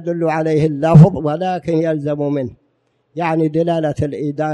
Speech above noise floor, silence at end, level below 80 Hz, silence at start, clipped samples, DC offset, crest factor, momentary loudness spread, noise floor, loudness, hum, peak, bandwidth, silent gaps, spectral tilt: 48 dB; 0 s; -46 dBFS; 0 s; 0.4%; under 0.1%; 16 dB; 12 LU; -63 dBFS; -16 LUFS; none; 0 dBFS; 7.2 kHz; none; -9 dB/octave